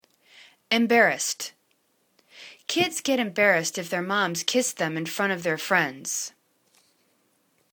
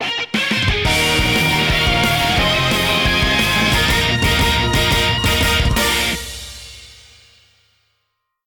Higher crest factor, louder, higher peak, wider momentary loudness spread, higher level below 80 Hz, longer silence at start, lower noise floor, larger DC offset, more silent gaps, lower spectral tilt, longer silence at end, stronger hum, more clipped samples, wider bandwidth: first, 22 dB vs 12 dB; second, -24 LUFS vs -15 LUFS; about the same, -6 dBFS vs -4 dBFS; first, 12 LU vs 5 LU; second, -74 dBFS vs -26 dBFS; first, 0.7 s vs 0 s; about the same, -69 dBFS vs -72 dBFS; neither; neither; about the same, -2.5 dB/octave vs -3.5 dB/octave; about the same, 1.45 s vs 1.55 s; neither; neither; about the same, 19.5 kHz vs over 20 kHz